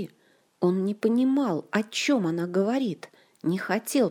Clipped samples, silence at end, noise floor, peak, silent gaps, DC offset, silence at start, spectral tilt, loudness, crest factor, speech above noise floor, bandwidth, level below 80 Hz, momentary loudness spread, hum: under 0.1%; 0 s; -63 dBFS; -10 dBFS; none; under 0.1%; 0 s; -5.5 dB/octave; -26 LUFS; 16 dB; 38 dB; 19.5 kHz; -78 dBFS; 7 LU; none